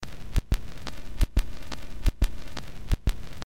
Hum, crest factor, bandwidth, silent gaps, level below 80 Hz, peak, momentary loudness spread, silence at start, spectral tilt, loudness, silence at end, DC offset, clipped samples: none; 22 dB; 16.5 kHz; none; -30 dBFS; -6 dBFS; 11 LU; 0 s; -5.5 dB/octave; -33 LUFS; 0 s; 3%; under 0.1%